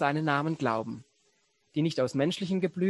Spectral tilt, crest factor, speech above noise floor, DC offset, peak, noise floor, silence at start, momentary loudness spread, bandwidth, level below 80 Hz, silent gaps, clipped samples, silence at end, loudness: -6.5 dB/octave; 20 dB; 42 dB; under 0.1%; -10 dBFS; -71 dBFS; 0 s; 9 LU; 12 kHz; -70 dBFS; none; under 0.1%; 0 s; -29 LUFS